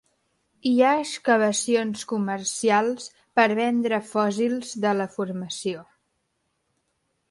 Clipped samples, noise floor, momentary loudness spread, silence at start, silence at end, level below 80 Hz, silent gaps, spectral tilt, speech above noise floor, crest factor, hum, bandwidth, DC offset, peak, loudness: under 0.1%; -74 dBFS; 10 LU; 0.65 s; 1.5 s; -72 dBFS; none; -4 dB/octave; 51 dB; 18 dB; none; 11.5 kHz; under 0.1%; -6 dBFS; -24 LUFS